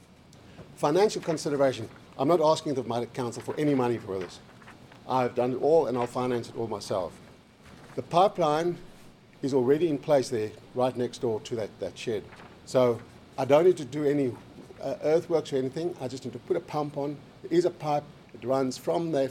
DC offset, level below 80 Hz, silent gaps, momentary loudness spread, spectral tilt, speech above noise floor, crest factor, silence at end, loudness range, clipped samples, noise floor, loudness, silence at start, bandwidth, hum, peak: under 0.1%; -64 dBFS; none; 15 LU; -6 dB/octave; 26 dB; 20 dB; 0 s; 3 LU; under 0.1%; -53 dBFS; -28 LUFS; 0.5 s; 15 kHz; none; -8 dBFS